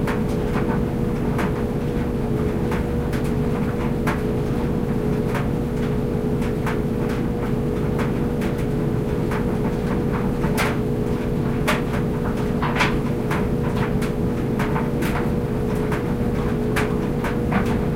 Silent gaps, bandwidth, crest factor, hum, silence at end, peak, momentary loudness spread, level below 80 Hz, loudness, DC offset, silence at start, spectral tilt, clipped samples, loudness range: none; 16 kHz; 16 dB; none; 0 s; -4 dBFS; 2 LU; -30 dBFS; -22 LUFS; under 0.1%; 0 s; -7.5 dB/octave; under 0.1%; 1 LU